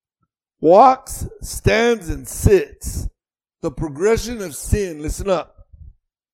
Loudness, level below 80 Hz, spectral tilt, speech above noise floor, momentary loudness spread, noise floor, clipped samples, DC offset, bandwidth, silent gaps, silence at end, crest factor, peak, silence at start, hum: -18 LUFS; -30 dBFS; -5.5 dB/octave; 63 dB; 17 LU; -81 dBFS; under 0.1%; under 0.1%; 17 kHz; none; 0.5 s; 18 dB; 0 dBFS; 0.6 s; none